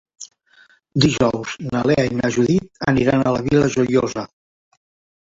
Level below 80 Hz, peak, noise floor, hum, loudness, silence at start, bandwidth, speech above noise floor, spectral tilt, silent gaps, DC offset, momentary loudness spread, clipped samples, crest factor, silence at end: -44 dBFS; -2 dBFS; -54 dBFS; none; -18 LUFS; 0.2 s; 7.8 kHz; 36 dB; -6 dB/octave; none; under 0.1%; 14 LU; under 0.1%; 18 dB; 1 s